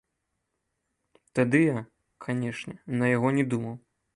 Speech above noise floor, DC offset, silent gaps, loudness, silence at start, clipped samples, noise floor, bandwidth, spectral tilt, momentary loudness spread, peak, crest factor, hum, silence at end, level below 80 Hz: 54 dB; under 0.1%; none; -27 LUFS; 1.35 s; under 0.1%; -80 dBFS; 11 kHz; -7.5 dB/octave; 15 LU; -8 dBFS; 20 dB; none; 0.4 s; -68 dBFS